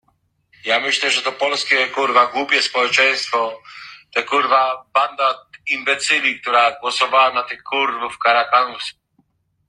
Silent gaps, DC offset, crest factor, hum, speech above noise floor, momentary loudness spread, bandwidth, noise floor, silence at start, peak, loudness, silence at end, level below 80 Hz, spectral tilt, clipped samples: none; under 0.1%; 18 dB; none; 46 dB; 9 LU; 11 kHz; -64 dBFS; 0.65 s; -2 dBFS; -17 LUFS; 0.75 s; -68 dBFS; -0.5 dB/octave; under 0.1%